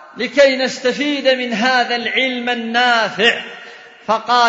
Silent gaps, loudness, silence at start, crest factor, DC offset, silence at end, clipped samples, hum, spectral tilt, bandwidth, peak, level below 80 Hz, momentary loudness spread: none; -15 LUFS; 0 s; 16 dB; under 0.1%; 0 s; under 0.1%; none; -3 dB/octave; 8 kHz; 0 dBFS; -66 dBFS; 8 LU